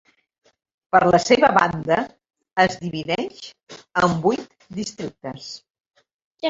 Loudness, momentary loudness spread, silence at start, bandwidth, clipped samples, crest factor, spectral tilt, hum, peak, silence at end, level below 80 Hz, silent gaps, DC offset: -20 LUFS; 19 LU; 0.95 s; 8 kHz; under 0.1%; 22 dB; -5 dB/octave; none; -2 dBFS; 0 s; -56 dBFS; 3.63-3.67 s, 6.14-6.31 s; under 0.1%